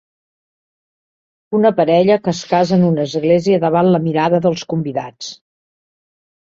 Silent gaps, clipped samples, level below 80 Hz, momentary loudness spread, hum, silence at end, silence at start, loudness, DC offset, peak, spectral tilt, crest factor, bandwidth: none; under 0.1%; -58 dBFS; 11 LU; none; 1.25 s; 1.5 s; -15 LUFS; under 0.1%; -2 dBFS; -7 dB/octave; 16 dB; 7.6 kHz